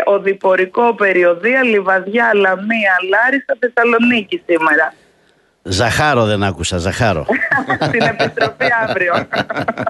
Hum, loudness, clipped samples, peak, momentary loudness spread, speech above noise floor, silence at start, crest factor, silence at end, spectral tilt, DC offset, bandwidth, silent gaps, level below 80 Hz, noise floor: none; -14 LUFS; under 0.1%; -2 dBFS; 5 LU; 41 dB; 0 s; 14 dB; 0 s; -5 dB/octave; under 0.1%; 12 kHz; none; -44 dBFS; -55 dBFS